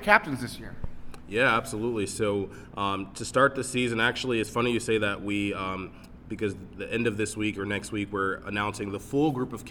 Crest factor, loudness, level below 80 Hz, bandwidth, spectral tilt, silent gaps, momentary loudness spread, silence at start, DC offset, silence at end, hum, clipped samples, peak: 26 dB; -28 LUFS; -50 dBFS; 19 kHz; -4.5 dB/octave; none; 14 LU; 0 s; under 0.1%; 0 s; none; under 0.1%; -2 dBFS